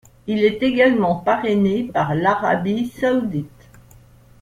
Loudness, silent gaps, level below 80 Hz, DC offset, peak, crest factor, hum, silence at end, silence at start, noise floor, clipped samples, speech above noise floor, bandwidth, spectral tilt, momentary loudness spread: -19 LUFS; none; -50 dBFS; under 0.1%; -2 dBFS; 16 dB; none; 0.95 s; 0.25 s; -48 dBFS; under 0.1%; 29 dB; 14 kHz; -7.5 dB/octave; 9 LU